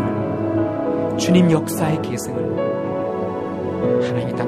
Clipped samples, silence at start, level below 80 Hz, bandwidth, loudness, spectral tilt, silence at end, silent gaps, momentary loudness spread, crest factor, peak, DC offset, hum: under 0.1%; 0 s; -50 dBFS; 15.5 kHz; -20 LUFS; -6.5 dB/octave; 0 s; none; 9 LU; 16 dB; -2 dBFS; under 0.1%; none